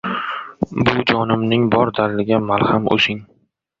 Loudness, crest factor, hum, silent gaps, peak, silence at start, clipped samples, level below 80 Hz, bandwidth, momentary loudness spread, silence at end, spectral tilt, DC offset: -17 LUFS; 18 dB; none; none; 0 dBFS; 0.05 s; under 0.1%; -48 dBFS; 7.6 kHz; 9 LU; 0.55 s; -7 dB/octave; under 0.1%